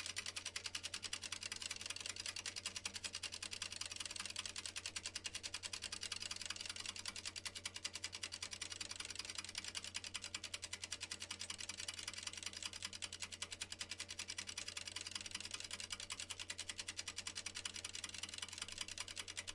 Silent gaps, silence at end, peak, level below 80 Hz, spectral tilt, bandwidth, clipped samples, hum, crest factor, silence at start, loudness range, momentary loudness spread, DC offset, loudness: none; 0 s; -26 dBFS; -72 dBFS; 0 dB/octave; 12 kHz; under 0.1%; none; 22 dB; 0 s; 1 LU; 2 LU; under 0.1%; -46 LUFS